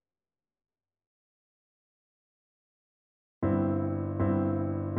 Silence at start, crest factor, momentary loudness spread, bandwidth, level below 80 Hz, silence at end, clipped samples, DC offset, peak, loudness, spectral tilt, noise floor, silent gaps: 3.4 s; 18 dB; 4 LU; 3.4 kHz; -58 dBFS; 0 s; under 0.1%; under 0.1%; -16 dBFS; -30 LUFS; -11 dB/octave; under -90 dBFS; none